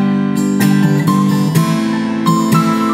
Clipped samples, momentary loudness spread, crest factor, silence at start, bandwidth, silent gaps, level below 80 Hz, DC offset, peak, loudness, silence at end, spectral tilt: under 0.1%; 3 LU; 12 dB; 0 s; 16 kHz; none; -54 dBFS; under 0.1%; 0 dBFS; -13 LUFS; 0 s; -6.5 dB/octave